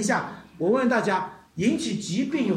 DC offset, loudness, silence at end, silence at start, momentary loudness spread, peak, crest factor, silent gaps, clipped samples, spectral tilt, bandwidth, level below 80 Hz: under 0.1%; -25 LUFS; 0 s; 0 s; 7 LU; -10 dBFS; 16 dB; none; under 0.1%; -5 dB/octave; 13.5 kHz; -64 dBFS